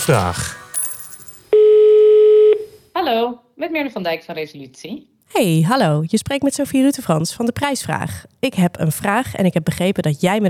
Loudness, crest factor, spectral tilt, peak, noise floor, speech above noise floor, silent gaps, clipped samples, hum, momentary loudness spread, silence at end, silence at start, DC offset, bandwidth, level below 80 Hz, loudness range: -16 LUFS; 14 dB; -5.5 dB/octave; -2 dBFS; -38 dBFS; 19 dB; none; under 0.1%; none; 18 LU; 0 s; 0 s; under 0.1%; 19.5 kHz; -52 dBFS; 6 LU